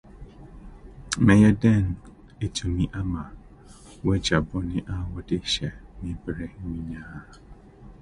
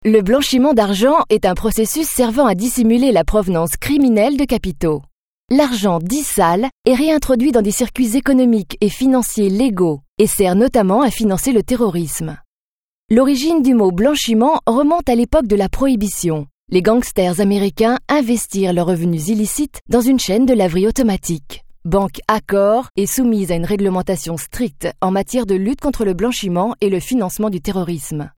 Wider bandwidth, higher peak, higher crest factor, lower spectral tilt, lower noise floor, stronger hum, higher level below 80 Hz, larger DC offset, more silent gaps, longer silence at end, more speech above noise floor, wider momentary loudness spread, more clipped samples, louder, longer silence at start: second, 11.5 kHz vs 18 kHz; second, -4 dBFS vs 0 dBFS; first, 22 dB vs 16 dB; about the same, -6 dB/octave vs -5 dB/octave; second, -48 dBFS vs under -90 dBFS; neither; second, -40 dBFS vs -34 dBFS; neither; second, none vs 5.12-5.48 s, 6.72-6.84 s, 10.08-10.17 s, 12.45-13.09 s, 16.51-16.67 s, 19.81-19.86 s, 22.90-22.95 s; about the same, 0.1 s vs 0.1 s; second, 24 dB vs over 75 dB; first, 19 LU vs 7 LU; neither; second, -25 LUFS vs -16 LUFS; about the same, 0.05 s vs 0 s